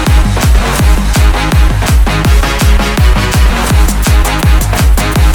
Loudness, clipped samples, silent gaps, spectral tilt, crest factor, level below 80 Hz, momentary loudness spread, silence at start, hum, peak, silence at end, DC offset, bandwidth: -10 LUFS; under 0.1%; none; -5 dB/octave; 8 dB; -8 dBFS; 1 LU; 0 s; none; 0 dBFS; 0 s; under 0.1%; 19 kHz